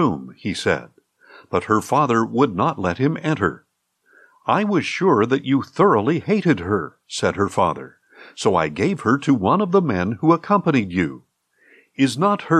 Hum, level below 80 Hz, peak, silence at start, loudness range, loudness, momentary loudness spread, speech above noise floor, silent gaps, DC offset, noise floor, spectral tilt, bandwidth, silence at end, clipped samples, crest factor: none; -60 dBFS; -4 dBFS; 0 s; 2 LU; -20 LUFS; 7 LU; 43 dB; none; under 0.1%; -62 dBFS; -6.5 dB/octave; 13 kHz; 0 s; under 0.1%; 16 dB